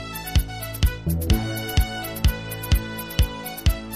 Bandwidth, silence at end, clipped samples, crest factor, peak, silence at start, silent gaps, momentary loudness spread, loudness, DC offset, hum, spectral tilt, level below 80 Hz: 15.5 kHz; 0 s; under 0.1%; 16 dB; -8 dBFS; 0 s; none; 4 LU; -25 LUFS; 0.2%; none; -5 dB/octave; -26 dBFS